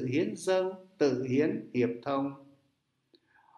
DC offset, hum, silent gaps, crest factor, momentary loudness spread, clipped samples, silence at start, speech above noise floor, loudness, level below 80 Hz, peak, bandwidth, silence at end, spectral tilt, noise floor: under 0.1%; none; none; 18 dB; 7 LU; under 0.1%; 0 s; 46 dB; -31 LUFS; -74 dBFS; -14 dBFS; 12 kHz; 1.15 s; -6.5 dB/octave; -76 dBFS